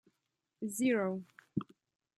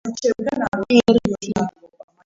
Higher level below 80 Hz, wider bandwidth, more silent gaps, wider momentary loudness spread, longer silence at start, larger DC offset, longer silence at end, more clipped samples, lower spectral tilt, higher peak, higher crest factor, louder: second, -78 dBFS vs -48 dBFS; first, 14 kHz vs 7.8 kHz; second, none vs 0.68-0.72 s; first, 13 LU vs 10 LU; first, 0.6 s vs 0.05 s; neither; about the same, 0.55 s vs 0.55 s; neither; about the same, -5.5 dB/octave vs -5.5 dB/octave; second, -20 dBFS vs 0 dBFS; about the same, 18 dB vs 20 dB; second, -36 LUFS vs -19 LUFS